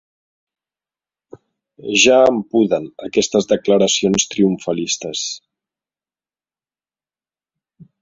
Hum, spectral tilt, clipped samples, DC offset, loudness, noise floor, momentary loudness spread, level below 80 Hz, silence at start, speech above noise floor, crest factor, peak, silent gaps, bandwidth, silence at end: none; -3.5 dB/octave; under 0.1%; under 0.1%; -16 LUFS; under -90 dBFS; 12 LU; -56 dBFS; 1.85 s; over 74 dB; 18 dB; -2 dBFS; none; 8 kHz; 2.65 s